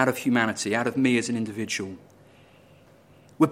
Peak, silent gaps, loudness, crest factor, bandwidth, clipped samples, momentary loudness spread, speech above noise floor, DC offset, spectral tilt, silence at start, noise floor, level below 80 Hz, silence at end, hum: -4 dBFS; none; -25 LUFS; 22 dB; 16.5 kHz; under 0.1%; 8 LU; 29 dB; under 0.1%; -4.5 dB/octave; 0 s; -54 dBFS; -68 dBFS; 0 s; none